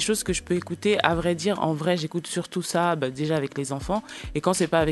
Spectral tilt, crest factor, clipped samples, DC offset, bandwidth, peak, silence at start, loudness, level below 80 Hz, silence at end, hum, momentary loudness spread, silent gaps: -4.5 dB/octave; 24 dB; under 0.1%; under 0.1%; 12.5 kHz; -2 dBFS; 0 s; -25 LUFS; -46 dBFS; 0 s; none; 7 LU; none